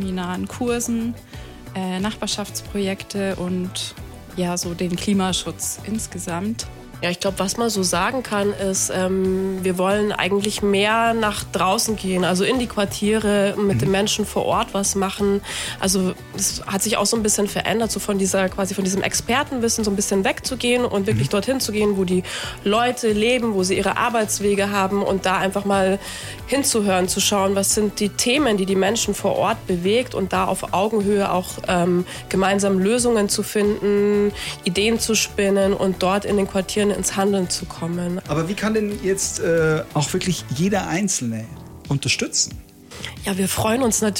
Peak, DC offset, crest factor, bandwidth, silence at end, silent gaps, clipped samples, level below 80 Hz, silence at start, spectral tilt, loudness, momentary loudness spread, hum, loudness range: 0 dBFS; under 0.1%; 20 dB; 17 kHz; 0 s; none; under 0.1%; -44 dBFS; 0 s; -4 dB/octave; -20 LUFS; 8 LU; none; 5 LU